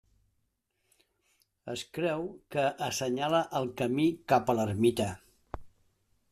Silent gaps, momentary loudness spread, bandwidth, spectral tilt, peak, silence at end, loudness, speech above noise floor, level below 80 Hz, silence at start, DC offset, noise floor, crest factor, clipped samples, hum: none; 20 LU; 14.5 kHz; -5 dB/octave; -10 dBFS; 0.65 s; -30 LUFS; 48 dB; -60 dBFS; 1.65 s; under 0.1%; -78 dBFS; 22 dB; under 0.1%; none